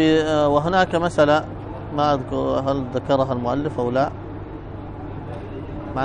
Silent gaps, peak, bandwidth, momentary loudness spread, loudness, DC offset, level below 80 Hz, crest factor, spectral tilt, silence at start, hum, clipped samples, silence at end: none; -4 dBFS; 10 kHz; 16 LU; -20 LUFS; under 0.1%; -40 dBFS; 18 dB; -6.5 dB/octave; 0 s; none; under 0.1%; 0 s